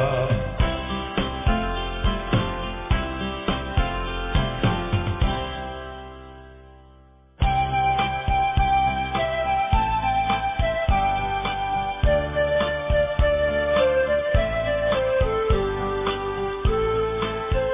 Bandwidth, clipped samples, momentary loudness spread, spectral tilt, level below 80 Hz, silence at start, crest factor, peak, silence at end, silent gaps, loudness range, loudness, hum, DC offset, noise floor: 3.8 kHz; under 0.1%; 6 LU; -10 dB/octave; -30 dBFS; 0 s; 16 dB; -6 dBFS; 0 s; none; 5 LU; -23 LUFS; none; under 0.1%; -51 dBFS